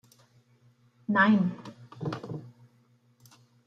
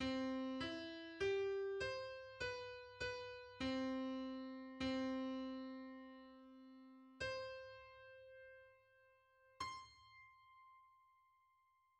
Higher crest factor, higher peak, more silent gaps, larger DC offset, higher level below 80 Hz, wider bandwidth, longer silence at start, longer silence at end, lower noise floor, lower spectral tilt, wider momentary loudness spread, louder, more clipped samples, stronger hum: about the same, 22 dB vs 18 dB; first, -10 dBFS vs -30 dBFS; neither; neither; second, -76 dBFS vs -70 dBFS; second, 7.2 kHz vs 9.4 kHz; first, 1.1 s vs 0 s; about the same, 1.15 s vs 1.05 s; second, -65 dBFS vs -78 dBFS; first, -7.5 dB/octave vs -5 dB/octave; about the same, 21 LU vs 20 LU; first, -27 LUFS vs -46 LUFS; neither; neither